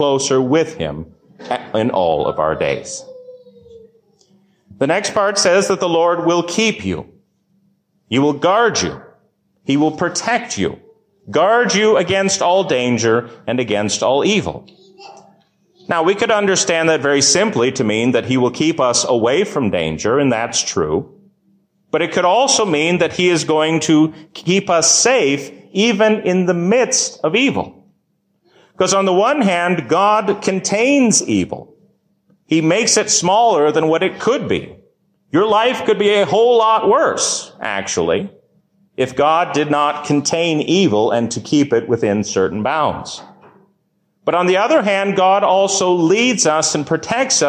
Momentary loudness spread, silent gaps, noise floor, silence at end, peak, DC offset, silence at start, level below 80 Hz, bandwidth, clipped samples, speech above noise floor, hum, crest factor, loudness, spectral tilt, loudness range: 9 LU; none; -65 dBFS; 0 s; -2 dBFS; under 0.1%; 0 s; -50 dBFS; 15.5 kHz; under 0.1%; 50 dB; none; 14 dB; -15 LUFS; -3.5 dB/octave; 4 LU